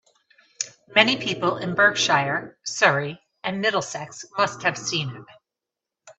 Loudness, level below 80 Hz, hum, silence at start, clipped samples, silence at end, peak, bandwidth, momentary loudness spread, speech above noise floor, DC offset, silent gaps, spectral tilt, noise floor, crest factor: -22 LUFS; -68 dBFS; none; 0.6 s; under 0.1%; 0.05 s; 0 dBFS; 8.4 kHz; 14 LU; 64 dB; under 0.1%; none; -3 dB/octave; -87 dBFS; 24 dB